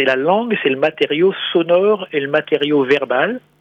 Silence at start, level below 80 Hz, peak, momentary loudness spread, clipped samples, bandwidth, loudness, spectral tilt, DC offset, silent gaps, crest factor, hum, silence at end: 0 s; -68 dBFS; -2 dBFS; 4 LU; under 0.1%; 6.8 kHz; -16 LUFS; -6.5 dB/octave; under 0.1%; none; 14 dB; none; 0.25 s